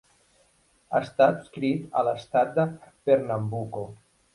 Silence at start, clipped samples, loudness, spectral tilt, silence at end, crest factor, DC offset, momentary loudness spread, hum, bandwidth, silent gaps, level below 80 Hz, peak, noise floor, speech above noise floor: 0.9 s; under 0.1%; -26 LUFS; -7.5 dB/octave; 0.4 s; 20 dB; under 0.1%; 11 LU; none; 11.5 kHz; none; -64 dBFS; -6 dBFS; -64 dBFS; 39 dB